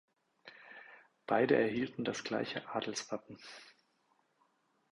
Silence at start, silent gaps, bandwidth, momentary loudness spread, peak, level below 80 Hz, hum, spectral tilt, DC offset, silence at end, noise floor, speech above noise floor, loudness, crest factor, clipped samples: 0.45 s; none; 11.5 kHz; 24 LU; -16 dBFS; -76 dBFS; none; -4.5 dB/octave; under 0.1%; 1.2 s; -76 dBFS; 40 dB; -35 LUFS; 24 dB; under 0.1%